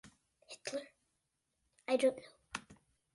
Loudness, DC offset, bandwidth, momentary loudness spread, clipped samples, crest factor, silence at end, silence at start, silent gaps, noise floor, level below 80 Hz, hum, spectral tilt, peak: -38 LUFS; under 0.1%; 11.5 kHz; 20 LU; under 0.1%; 22 dB; 0.4 s; 0.05 s; none; -84 dBFS; -78 dBFS; none; -3 dB/octave; -20 dBFS